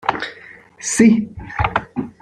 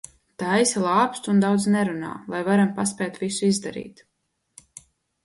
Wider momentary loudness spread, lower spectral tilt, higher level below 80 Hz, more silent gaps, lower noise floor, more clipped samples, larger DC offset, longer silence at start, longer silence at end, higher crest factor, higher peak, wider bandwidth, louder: first, 15 LU vs 12 LU; about the same, -4.5 dB/octave vs -5 dB/octave; first, -40 dBFS vs -64 dBFS; neither; second, -42 dBFS vs -54 dBFS; neither; neither; second, 0.05 s vs 0.4 s; second, 0.1 s vs 1.35 s; about the same, 18 dB vs 18 dB; first, 0 dBFS vs -6 dBFS; about the same, 12 kHz vs 11.5 kHz; first, -18 LUFS vs -22 LUFS